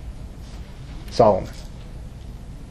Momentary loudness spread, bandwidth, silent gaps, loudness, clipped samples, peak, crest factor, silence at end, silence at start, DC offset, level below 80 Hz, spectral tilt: 22 LU; 13 kHz; none; -19 LUFS; under 0.1%; -2 dBFS; 22 dB; 0 s; 0 s; under 0.1%; -36 dBFS; -7 dB/octave